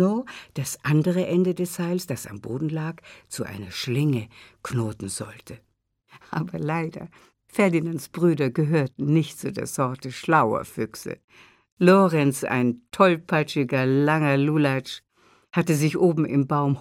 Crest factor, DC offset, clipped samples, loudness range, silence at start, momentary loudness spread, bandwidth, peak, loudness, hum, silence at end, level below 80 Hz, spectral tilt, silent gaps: 20 dB; under 0.1%; under 0.1%; 8 LU; 0 s; 13 LU; 16.5 kHz; -4 dBFS; -24 LUFS; none; 0 s; -62 dBFS; -6.5 dB/octave; 11.24-11.28 s, 11.72-11.77 s